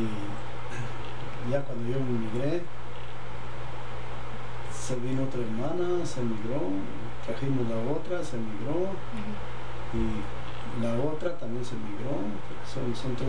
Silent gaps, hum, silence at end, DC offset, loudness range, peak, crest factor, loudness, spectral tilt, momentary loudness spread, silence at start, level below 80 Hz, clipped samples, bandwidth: none; none; 0 s; 6%; 3 LU; -14 dBFS; 16 dB; -34 LUFS; -6.5 dB/octave; 10 LU; 0 s; -48 dBFS; under 0.1%; 10 kHz